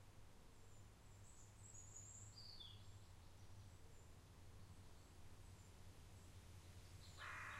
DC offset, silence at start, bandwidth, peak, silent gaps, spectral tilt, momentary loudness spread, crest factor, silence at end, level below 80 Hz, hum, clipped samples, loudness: under 0.1%; 0 s; 15.5 kHz; -42 dBFS; none; -3 dB/octave; 8 LU; 18 dB; 0 s; -68 dBFS; none; under 0.1%; -62 LUFS